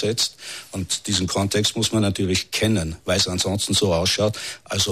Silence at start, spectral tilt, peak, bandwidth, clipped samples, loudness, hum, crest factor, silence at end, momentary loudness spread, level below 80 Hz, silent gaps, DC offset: 0 s; -3.5 dB/octave; -8 dBFS; 14 kHz; under 0.1%; -21 LUFS; none; 14 dB; 0 s; 7 LU; -46 dBFS; none; 0.1%